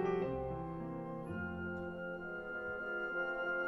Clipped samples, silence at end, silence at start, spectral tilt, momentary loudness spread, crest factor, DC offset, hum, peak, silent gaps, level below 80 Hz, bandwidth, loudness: under 0.1%; 0 s; 0 s; -8.5 dB/octave; 6 LU; 16 dB; under 0.1%; none; -24 dBFS; none; -60 dBFS; 11.5 kHz; -41 LUFS